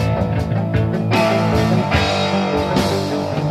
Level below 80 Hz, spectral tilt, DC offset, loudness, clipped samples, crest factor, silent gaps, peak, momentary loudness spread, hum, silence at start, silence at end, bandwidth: -34 dBFS; -6.5 dB/octave; under 0.1%; -17 LUFS; under 0.1%; 14 dB; none; -2 dBFS; 4 LU; none; 0 s; 0 s; 14.5 kHz